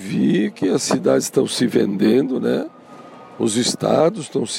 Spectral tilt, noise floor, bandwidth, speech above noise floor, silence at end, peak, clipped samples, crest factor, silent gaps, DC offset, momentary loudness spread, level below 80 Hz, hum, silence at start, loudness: -5 dB/octave; -40 dBFS; 16.5 kHz; 22 dB; 0 s; -4 dBFS; under 0.1%; 14 dB; none; under 0.1%; 6 LU; -62 dBFS; none; 0 s; -18 LUFS